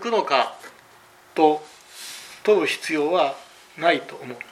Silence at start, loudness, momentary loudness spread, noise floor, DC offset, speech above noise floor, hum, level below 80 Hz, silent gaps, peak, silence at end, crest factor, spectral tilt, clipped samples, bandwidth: 0 s; -22 LUFS; 18 LU; -51 dBFS; under 0.1%; 30 dB; none; -76 dBFS; none; -4 dBFS; 0.1 s; 20 dB; -3.5 dB/octave; under 0.1%; 14.5 kHz